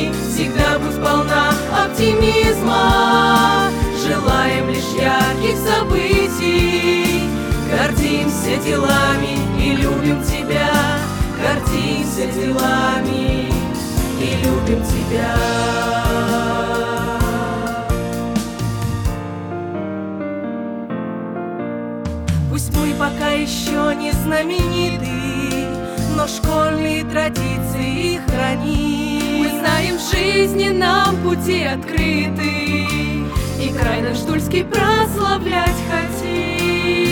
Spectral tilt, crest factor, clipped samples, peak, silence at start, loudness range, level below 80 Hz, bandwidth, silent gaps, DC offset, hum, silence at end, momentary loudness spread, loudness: -5 dB/octave; 16 dB; under 0.1%; -2 dBFS; 0 s; 7 LU; -30 dBFS; over 20 kHz; none; under 0.1%; none; 0 s; 7 LU; -18 LUFS